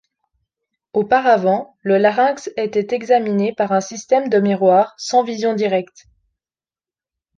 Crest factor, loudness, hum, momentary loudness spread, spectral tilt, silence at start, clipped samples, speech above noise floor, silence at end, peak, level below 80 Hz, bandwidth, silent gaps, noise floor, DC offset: 16 dB; -17 LUFS; none; 7 LU; -5.5 dB/octave; 0.95 s; under 0.1%; over 73 dB; 1.5 s; -2 dBFS; -64 dBFS; 9.2 kHz; none; under -90 dBFS; under 0.1%